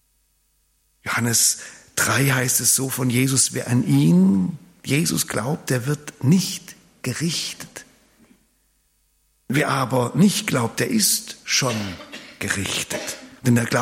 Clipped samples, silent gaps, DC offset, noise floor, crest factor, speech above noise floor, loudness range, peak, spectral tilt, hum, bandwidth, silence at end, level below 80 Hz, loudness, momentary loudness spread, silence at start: under 0.1%; none; under 0.1%; -65 dBFS; 18 dB; 45 dB; 8 LU; -4 dBFS; -4 dB/octave; none; 16.5 kHz; 0 s; -58 dBFS; -20 LUFS; 14 LU; 1.05 s